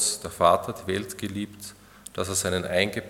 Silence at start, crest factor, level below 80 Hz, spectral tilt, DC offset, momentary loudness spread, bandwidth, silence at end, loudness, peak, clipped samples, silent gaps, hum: 0 s; 22 dB; -60 dBFS; -3 dB/octave; under 0.1%; 18 LU; 18 kHz; 0 s; -26 LUFS; -4 dBFS; under 0.1%; none; none